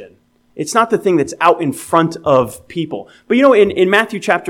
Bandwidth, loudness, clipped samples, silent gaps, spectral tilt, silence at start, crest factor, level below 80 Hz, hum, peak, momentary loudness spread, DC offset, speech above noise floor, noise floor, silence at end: 17 kHz; -14 LUFS; under 0.1%; none; -5 dB/octave; 0 s; 14 dB; -54 dBFS; none; 0 dBFS; 13 LU; under 0.1%; 36 dB; -50 dBFS; 0 s